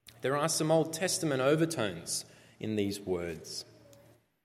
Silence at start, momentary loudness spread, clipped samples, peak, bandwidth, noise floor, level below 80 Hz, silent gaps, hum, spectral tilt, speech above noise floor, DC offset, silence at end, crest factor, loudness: 0.05 s; 14 LU; under 0.1%; -14 dBFS; 16 kHz; -62 dBFS; -72 dBFS; none; none; -4 dB/octave; 31 dB; under 0.1%; 0.8 s; 18 dB; -31 LUFS